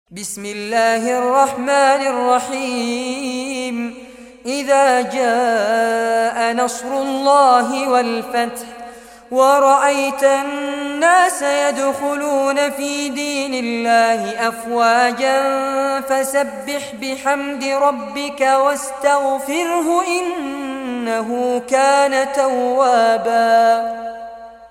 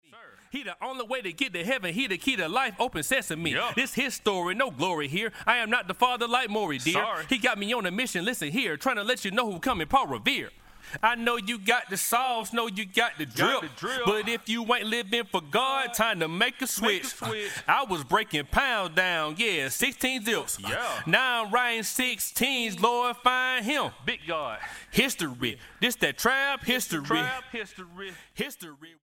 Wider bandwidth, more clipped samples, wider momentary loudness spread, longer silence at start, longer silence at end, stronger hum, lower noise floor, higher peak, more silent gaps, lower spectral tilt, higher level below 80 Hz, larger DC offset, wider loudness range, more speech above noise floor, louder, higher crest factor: about the same, 16.5 kHz vs 17 kHz; neither; first, 11 LU vs 8 LU; about the same, 0.1 s vs 0.15 s; about the same, 0.05 s vs 0.1 s; neither; second, -37 dBFS vs -53 dBFS; first, -2 dBFS vs -6 dBFS; neither; about the same, -2.5 dB/octave vs -2.5 dB/octave; second, -60 dBFS vs -54 dBFS; neither; about the same, 3 LU vs 2 LU; second, 20 dB vs 25 dB; first, -17 LUFS vs -27 LUFS; second, 14 dB vs 22 dB